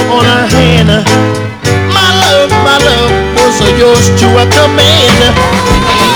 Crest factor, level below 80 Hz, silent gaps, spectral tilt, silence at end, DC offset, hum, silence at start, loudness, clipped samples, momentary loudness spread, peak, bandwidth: 6 dB; -22 dBFS; none; -4.5 dB/octave; 0 s; under 0.1%; none; 0 s; -6 LUFS; 3%; 4 LU; 0 dBFS; over 20 kHz